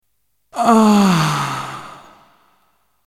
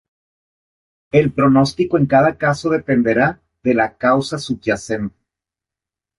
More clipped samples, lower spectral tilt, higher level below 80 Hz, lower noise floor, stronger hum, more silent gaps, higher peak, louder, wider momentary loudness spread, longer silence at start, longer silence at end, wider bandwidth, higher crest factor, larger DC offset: neither; about the same, -5.5 dB/octave vs -6.5 dB/octave; second, -56 dBFS vs -48 dBFS; second, -70 dBFS vs -87 dBFS; neither; neither; about the same, 0 dBFS vs -2 dBFS; about the same, -15 LUFS vs -17 LUFS; first, 21 LU vs 9 LU; second, 0.55 s vs 1.15 s; about the same, 1.15 s vs 1.1 s; first, 15 kHz vs 11.5 kHz; about the same, 18 dB vs 16 dB; neither